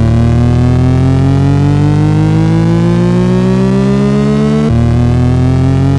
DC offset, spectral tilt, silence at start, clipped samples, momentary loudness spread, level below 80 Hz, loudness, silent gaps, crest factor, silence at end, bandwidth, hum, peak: under 0.1%; -8.5 dB/octave; 0 s; under 0.1%; 1 LU; -24 dBFS; -9 LUFS; none; 8 dB; 0 s; 10.5 kHz; none; 0 dBFS